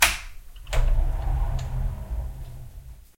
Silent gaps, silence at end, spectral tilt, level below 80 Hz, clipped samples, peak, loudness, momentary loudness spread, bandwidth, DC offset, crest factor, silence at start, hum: none; 0.15 s; -2.5 dB/octave; -26 dBFS; under 0.1%; -2 dBFS; -29 LUFS; 18 LU; 16.5 kHz; under 0.1%; 24 dB; 0 s; none